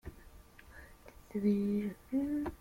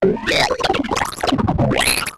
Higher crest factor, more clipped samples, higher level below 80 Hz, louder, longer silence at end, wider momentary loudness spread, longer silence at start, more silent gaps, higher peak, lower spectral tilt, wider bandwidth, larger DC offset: about the same, 16 dB vs 12 dB; neither; second, -56 dBFS vs -36 dBFS; second, -35 LUFS vs -17 LUFS; about the same, 0.05 s vs 0 s; first, 23 LU vs 4 LU; about the same, 0.05 s vs 0 s; neither; second, -22 dBFS vs -6 dBFS; first, -8.5 dB/octave vs -4 dB/octave; about the same, 16 kHz vs 15.5 kHz; neither